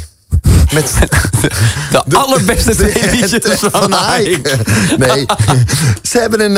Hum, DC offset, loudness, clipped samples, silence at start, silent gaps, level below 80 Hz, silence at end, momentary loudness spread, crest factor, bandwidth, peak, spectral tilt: none; under 0.1%; -11 LUFS; under 0.1%; 0 s; none; -20 dBFS; 0 s; 3 LU; 10 dB; 16.5 kHz; 0 dBFS; -4.5 dB/octave